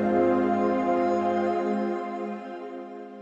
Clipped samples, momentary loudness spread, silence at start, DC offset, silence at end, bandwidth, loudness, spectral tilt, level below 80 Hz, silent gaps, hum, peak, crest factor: under 0.1%; 15 LU; 0 s; under 0.1%; 0 s; 7.8 kHz; -26 LUFS; -8 dB/octave; -64 dBFS; none; none; -12 dBFS; 14 dB